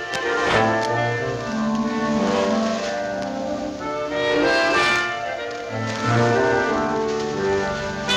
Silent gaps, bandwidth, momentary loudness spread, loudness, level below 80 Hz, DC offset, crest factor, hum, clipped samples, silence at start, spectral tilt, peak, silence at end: none; 12.5 kHz; 9 LU; -21 LUFS; -48 dBFS; under 0.1%; 14 dB; none; under 0.1%; 0 s; -5 dB/octave; -6 dBFS; 0 s